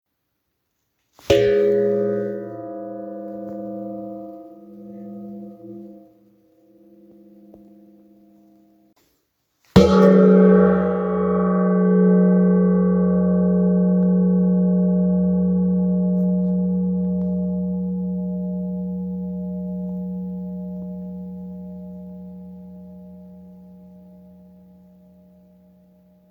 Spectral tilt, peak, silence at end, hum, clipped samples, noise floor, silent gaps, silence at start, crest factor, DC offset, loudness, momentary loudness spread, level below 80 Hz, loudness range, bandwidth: -9 dB/octave; 0 dBFS; 2.75 s; none; under 0.1%; -75 dBFS; none; 1.3 s; 20 dB; under 0.1%; -19 LUFS; 22 LU; -48 dBFS; 21 LU; 7.2 kHz